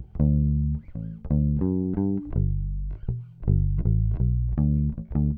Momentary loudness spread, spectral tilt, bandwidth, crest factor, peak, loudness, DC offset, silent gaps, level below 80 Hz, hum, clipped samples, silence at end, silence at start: 9 LU; -15 dB/octave; 2.1 kHz; 14 dB; -10 dBFS; -26 LUFS; under 0.1%; none; -30 dBFS; none; under 0.1%; 0 s; 0 s